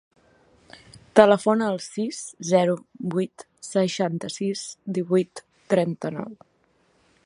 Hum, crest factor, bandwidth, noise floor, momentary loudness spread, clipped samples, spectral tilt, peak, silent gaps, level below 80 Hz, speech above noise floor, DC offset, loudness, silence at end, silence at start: none; 24 dB; 11.5 kHz; -65 dBFS; 15 LU; under 0.1%; -5.5 dB/octave; 0 dBFS; none; -68 dBFS; 41 dB; under 0.1%; -24 LUFS; 0.9 s; 1.15 s